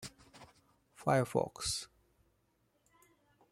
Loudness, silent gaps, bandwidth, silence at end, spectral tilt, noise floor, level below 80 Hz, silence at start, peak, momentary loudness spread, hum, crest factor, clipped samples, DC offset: -35 LUFS; none; 16 kHz; 1.65 s; -4.5 dB/octave; -76 dBFS; -64 dBFS; 0 s; -16 dBFS; 17 LU; none; 24 dB; under 0.1%; under 0.1%